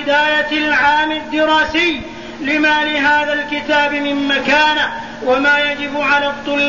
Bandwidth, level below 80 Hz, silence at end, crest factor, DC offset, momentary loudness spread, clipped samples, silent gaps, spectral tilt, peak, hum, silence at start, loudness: 7.4 kHz; -46 dBFS; 0 s; 12 dB; 0.7%; 6 LU; under 0.1%; none; -3.5 dB/octave; -2 dBFS; none; 0 s; -14 LUFS